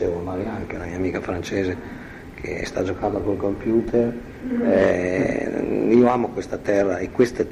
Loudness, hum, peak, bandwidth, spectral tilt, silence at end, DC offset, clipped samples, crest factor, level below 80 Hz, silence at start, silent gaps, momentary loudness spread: -22 LUFS; none; -4 dBFS; 12 kHz; -7 dB/octave; 0 s; under 0.1%; under 0.1%; 18 dB; -44 dBFS; 0 s; none; 12 LU